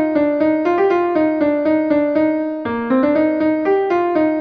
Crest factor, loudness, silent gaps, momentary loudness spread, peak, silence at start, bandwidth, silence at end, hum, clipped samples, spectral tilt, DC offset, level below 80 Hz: 12 dB; -16 LUFS; none; 3 LU; -4 dBFS; 0 s; 5.2 kHz; 0 s; none; under 0.1%; -8 dB/octave; under 0.1%; -54 dBFS